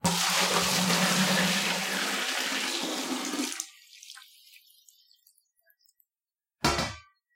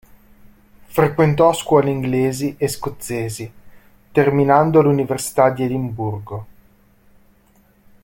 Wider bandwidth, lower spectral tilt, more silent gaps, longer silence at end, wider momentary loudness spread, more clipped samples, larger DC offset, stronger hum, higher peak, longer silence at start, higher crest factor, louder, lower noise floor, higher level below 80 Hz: about the same, 16.5 kHz vs 17 kHz; second, -2.5 dB/octave vs -6.5 dB/octave; neither; second, 0.35 s vs 1.55 s; first, 18 LU vs 13 LU; neither; neither; neither; second, -8 dBFS vs -2 dBFS; second, 0.05 s vs 0.9 s; about the same, 22 dB vs 18 dB; second, -26 LUFS vs -18 LUFS; first, under -90 dBFS vs -55 dBFS; about the same, -54 dBFS vs -50 dBFS